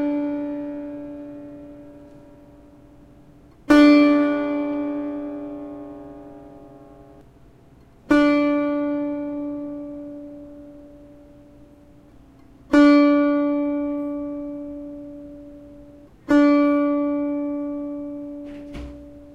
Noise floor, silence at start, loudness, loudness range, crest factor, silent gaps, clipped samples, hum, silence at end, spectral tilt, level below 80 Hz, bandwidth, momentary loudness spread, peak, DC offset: -50 dBFS; 0 s; -20 LUFS; 14 LU; 20 dB; none; under 0.1%; none; 0 s; -6 dB/octave; -52 dBFS; 7.4 kHz; 25 LU; -4 dBFS; under 0.1%